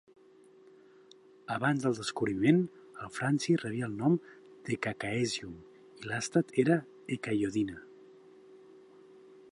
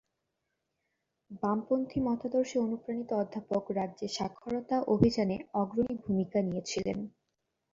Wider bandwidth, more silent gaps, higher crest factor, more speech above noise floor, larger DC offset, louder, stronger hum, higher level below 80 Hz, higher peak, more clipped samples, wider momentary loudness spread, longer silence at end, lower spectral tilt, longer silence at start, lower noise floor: first, 11.5 kHz vs 7.8 kHz; neither; about the same, 22 dB vs 24 dB; second, 28 dB vs 52 dB; neither; about the same, -32 LUFS vs -32 LUFS; neither; second, -68 dBFS vs -58 dBFS; about the same, -12 dBFS vs -10 dBFS; neither; first, 17 LU vs 9 LU; first, 0.8 s vs 0.65 s; about the same, -6 dB/octave vs -6.5 dB/octave; first, 1.5 s vs 1.3 s; second, -59 dBFS vs -83 dBFS